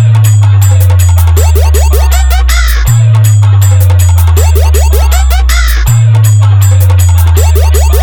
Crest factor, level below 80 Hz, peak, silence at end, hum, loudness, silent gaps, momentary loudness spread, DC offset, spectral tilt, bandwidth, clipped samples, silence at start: 4 dB; -8 dBFS; 0 dBFS; 0 s; none; -6 LUFS; none; 3 LU; under 0.1%; -5 dB/octave; over 20 kHz; 0.7%; 0 s